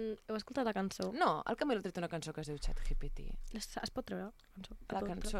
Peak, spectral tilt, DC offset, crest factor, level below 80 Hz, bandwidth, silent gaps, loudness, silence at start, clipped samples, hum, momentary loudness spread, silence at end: -18 dBFS; -5 dB/octave; under 0.1%; 20 dB; -44 dBFS; 13.5 kHz; none; -39 LUFS; 0 s; under 0.1%; none; 14 LU; 0 s